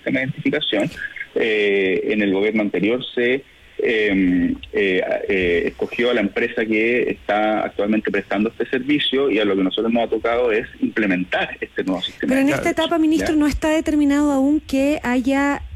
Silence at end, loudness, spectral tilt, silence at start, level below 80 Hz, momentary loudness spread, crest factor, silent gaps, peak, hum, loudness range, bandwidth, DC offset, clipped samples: 0 s; -19 LUFS; -5.5 dB/octave; 0.05 s; -44 dBFS; 5 LU; 10 dB; none; -8 dBFS; none; 2 LU; 13.5 kHz; under 0.1%; under 0.1%